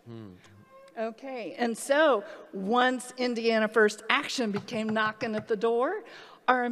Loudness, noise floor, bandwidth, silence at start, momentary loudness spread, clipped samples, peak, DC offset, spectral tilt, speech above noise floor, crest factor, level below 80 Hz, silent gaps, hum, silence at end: -28 LUFS; -54 dBFS; 14 kHz; 0.05 s; 14 LU; under 0.1%; -6 dBFS; under 0.1%; -4 dB/octave; 26 dB; 24 dB; -78 dBFS; none; none; 0 s